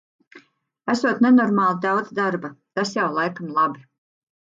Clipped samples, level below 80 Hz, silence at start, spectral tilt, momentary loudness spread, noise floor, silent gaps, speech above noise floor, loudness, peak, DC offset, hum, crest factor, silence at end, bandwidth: under 0.1%; -72 dBFS; 0.35 s; -6 dB/octave; 13 LU; -56 dBFS; none; 36 dB; -21 LUFS; -6 dBFS; under 0.1%; none; 16 dB; 0.6 s; 7.6 kHz